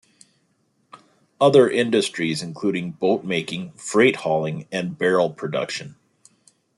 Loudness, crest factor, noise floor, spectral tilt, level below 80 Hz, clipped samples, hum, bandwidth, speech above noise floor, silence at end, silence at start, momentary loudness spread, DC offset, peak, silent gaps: -21 LUFS; 20 dB; -66 dBFS; -5 dB/octave; -66 dBFS; under 0.1%; none; 12 kHz; 46 dB; 0.85 s; 0.95 s; 12 LU; under 0.1%; -4 dBFS; none